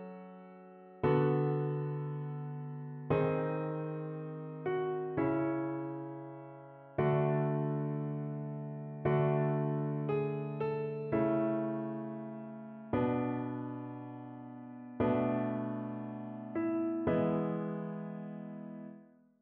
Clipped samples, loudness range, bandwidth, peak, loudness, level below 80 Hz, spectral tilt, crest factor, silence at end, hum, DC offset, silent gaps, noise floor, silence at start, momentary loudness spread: under 0.1%; 4 LU; 4.3 kHz; -18 dBFS; -35 LUFS; -66 dBFS; -8.5 dB/octave; 18 dB; 0.35 s; none; under 0.1%; none; -57 dBFS; 0 s; 16 LU